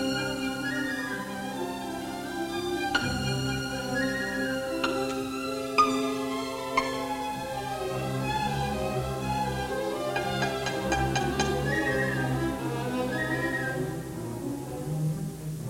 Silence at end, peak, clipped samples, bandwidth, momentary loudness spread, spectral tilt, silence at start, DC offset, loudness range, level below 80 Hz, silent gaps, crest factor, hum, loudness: 0 s; -10 dBFS; under 0.1%; 16.5 kHz; 7 LU; -5 dB/octave; 0 s; under 0.1%; 3 LU; -48 dBFS; none; 20 dB; none; -30 LUFS